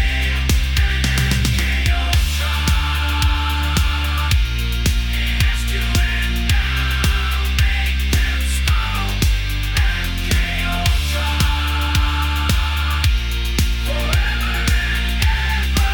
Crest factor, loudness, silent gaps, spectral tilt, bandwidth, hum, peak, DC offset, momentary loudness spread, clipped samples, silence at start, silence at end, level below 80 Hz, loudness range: 14 dB; -18 LUFS; none; -4 dB/octave; 19 kHz; none; -2 dBFS; under 0.1%; 2 LU; under 0.1%; 0 s; 0 s; -18 dBFS; 1 LU